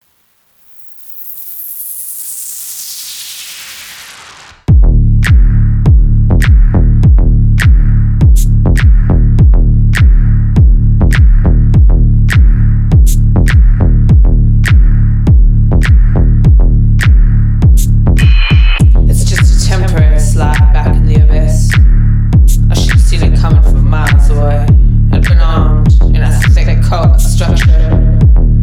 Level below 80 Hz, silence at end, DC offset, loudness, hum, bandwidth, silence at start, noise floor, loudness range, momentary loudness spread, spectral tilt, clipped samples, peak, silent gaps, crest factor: -8 dBFS; 0 s; under 0.1%; -9 LUFS; none; over 20 kHz; 1.1 s; -53 dBFS; 5 LU; 11 LU; -6.5 dB/octave; under 0.1%; 0 dBFS; none; 6 dB